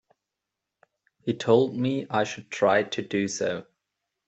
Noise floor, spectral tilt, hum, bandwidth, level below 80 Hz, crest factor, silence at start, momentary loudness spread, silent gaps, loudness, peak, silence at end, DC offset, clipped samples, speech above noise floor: -86 dBFS; -5 dB/octave; none; 8.2 kHz; -70 dBFS; 20 dB; 1.25 s; 10 LU; none; -26 LUFS; -8 dBFS; 0.65 s; under 0.1%; under 0.1%; 61 dB